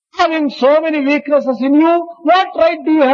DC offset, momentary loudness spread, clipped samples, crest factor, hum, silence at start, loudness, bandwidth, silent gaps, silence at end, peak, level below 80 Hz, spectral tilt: under 0.1%; 4 LU; under 0.1%; 12 dB; none; 0.15 s; -13 LUFS; 7.2 kHz; none; 0 s; 0 dBFS; -60 dBFS; -5 dB/octave